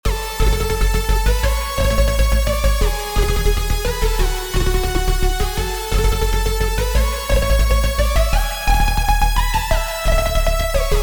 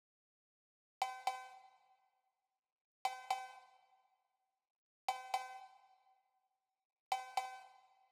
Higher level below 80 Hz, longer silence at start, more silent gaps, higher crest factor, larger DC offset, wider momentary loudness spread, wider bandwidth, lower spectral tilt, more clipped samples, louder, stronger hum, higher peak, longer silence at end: first, -18 dBFS vs under -90 dBFS; second, 0.05 s vs 1 s; second, none vs 2.72-3.05 s, 4.70-5.08 s, 6.85-6.90 s, 7.00-7.11 s; second, 14 dB vs 26 dB; first, 0.6% vs under 0.1%; second, 3 LU vs 18 LU; about the same, over 20 kHz vs over 20 kHz; first, -4 dB/octave vs 1.5 dB/octave; neither; first, -19 LUFS vs -44 LUFS; neither; first, -2 dBFS vs -22 dBFS; second, 0 s vs 0.35 s